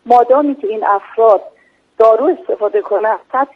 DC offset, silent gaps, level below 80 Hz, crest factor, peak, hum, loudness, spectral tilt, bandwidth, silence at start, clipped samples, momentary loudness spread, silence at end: under 0.1%; none; -64 dBFS; 14 dB; 0 dBFS; none; -13 LUFS; -6 dB/octave; 6 kHz; 0.05 s; under 0.1%; 7 LU; 0.1 s